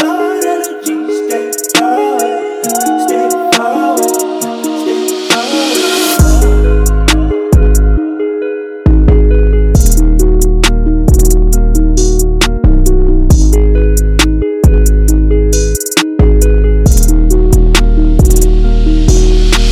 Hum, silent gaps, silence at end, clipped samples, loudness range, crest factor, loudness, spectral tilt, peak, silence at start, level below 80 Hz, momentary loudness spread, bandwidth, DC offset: none; none; 0 s; 2%; 3 LU; 8 dB; -11 LUFS; -5 dB/octave; 0 dBFS; 0 s; -10 dBFS; 6 LU; 16 kHz; under 0.1%